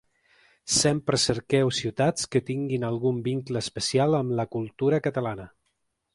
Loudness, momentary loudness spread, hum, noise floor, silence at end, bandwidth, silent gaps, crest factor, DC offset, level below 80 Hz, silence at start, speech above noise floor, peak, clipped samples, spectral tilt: -25 LUFS; 8 LU; none; -76 dBFS; 0.65 s; 11.5 kHz; none; 18 dB; under 0.1%; -56 dBFS; 0.65 s; 51 dB; -8 dBFS; under 0.1%; -4.5 dB/octave